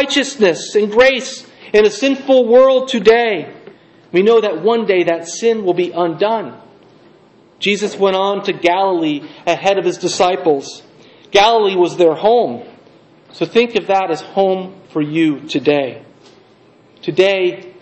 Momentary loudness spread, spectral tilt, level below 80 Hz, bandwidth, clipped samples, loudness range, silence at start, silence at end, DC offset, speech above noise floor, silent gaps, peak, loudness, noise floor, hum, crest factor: 10 LU; -4 dB/octave; -56 dBFS; 8.6 kHz; under 0.1%; 5 LU; 0 s; 0.1 s; under 0.1%; 34 dB; none; 0 dBFS; -14 LUFS; -48 dBFS; none; 16 dB